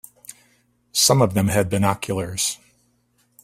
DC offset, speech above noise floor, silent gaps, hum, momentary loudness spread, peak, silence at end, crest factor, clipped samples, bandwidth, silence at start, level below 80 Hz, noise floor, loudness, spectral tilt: under 0.1%; 44 dB; none; 60 Hz at -50 dBFS; 24 LU; -2 dBFS; 0.9 s; 20 dB; under 0.1%; 16 kHz; 0.95 s; -52 dBFS; -64 dBFS; -20 LUFS; -4 dB/octave